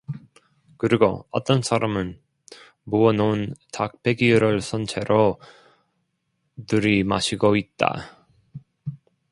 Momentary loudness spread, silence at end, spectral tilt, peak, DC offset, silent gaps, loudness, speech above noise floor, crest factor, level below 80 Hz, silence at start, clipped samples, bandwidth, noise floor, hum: 18 LU; 0.35 s; -6 dB/octave; 0 dBFS; under 0.1%; none; -22 LUFS; 52 dB; 22 dB; -52 dBFS; 0.1 s; under 0.1%; 11.5 kHz; -74 dBFS; none